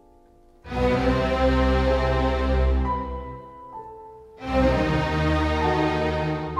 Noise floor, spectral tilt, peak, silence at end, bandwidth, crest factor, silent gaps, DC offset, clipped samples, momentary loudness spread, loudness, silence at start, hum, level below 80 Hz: -53 dBFS; -7 dB/octave; -8 dBFS; 0 s; 8.8 kHz; 14 dB; none; under 0.1%; under 0.1%; 18 LU; -23 LUFS; 0.65 s; none; -28 dBFS